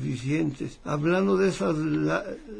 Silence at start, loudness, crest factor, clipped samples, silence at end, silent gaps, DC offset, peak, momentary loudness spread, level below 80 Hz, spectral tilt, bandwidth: 0 s; -26 LUFS; 14 dB; under 0.1%; 0 s; none; under 0.1%; -12 dBFS; 8 LU; -50 dBFS; -7 dB/octave; 10.5 kHz